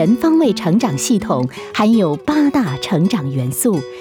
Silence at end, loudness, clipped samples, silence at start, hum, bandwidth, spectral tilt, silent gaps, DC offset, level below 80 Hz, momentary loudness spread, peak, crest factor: 0 s; -16 LUFS; under 0.1%; 0 s; none; 19.5 kHz; -5.5 dB/octave; none; under 0.1%; -50 dBFS; 6 LU; -4 dBFS; 12 dB